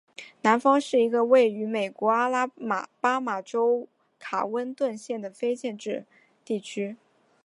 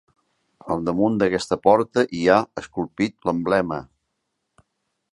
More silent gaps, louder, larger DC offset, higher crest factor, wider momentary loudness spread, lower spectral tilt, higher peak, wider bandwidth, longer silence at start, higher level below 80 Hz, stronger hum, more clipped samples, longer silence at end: neither; second, -26 LUFS vs -21 LUFS; neither; about the same, 20 dB vs 22 dB; about the same, 13 LU vs 11 LU; about the same, -5 dB/octave vs -6 dB/octave; second, -6 dBFS vs -2 dBFS; about the same, 11 kHz vs 11.5 kHz; second, 0.2 s vs 0.65 s; second, -84 dBFS vs -54 dBFS; neither; neither; second, 0.5 s vs 1.3 s